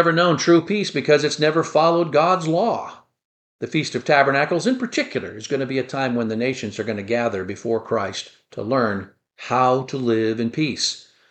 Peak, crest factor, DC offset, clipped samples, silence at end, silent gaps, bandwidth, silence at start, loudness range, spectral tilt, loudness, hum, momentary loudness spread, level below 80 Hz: -2 dBFS; 18 dB; under 0.1%; under 0.1%; 0.3 s; 3.25-3.59 s; 9 kHz; 0 s; 5 LU; -5 dB/octave; -20 LUFS; none; 11 LU; -66 dBFS